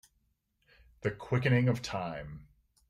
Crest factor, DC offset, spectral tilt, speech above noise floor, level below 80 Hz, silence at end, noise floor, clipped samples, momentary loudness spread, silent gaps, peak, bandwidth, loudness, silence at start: 18 dB; under 0.1%; -7 dB/octave; 45 dB; -60 dBFS; 0.45 s; -76 dBFS; under 0.1%; 18 LU; none; -16 dBFS; 11 kHz; -32 LUFS; 1.05 s